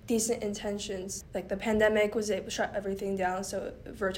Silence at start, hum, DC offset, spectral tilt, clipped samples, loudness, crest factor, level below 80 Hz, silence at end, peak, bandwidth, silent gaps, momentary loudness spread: 0.05 s; none; under 0.1%; -3.5 dB/octave; under 0.1%; -31 LUFS; 18 dB; -54 dBFS; 0 s; -12 dBFS; 16 kHz; none; 11 LU